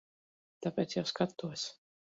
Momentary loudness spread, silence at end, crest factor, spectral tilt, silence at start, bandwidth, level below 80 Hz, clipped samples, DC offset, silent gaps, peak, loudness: 7 LU; 0.4 s; 22 dB; -4.5 dB/octave; 0.6 s; 7.6 kHz; -76 dBFS; under 0.1%; under 0.1%; none; -16 dBFS; -37 LUFS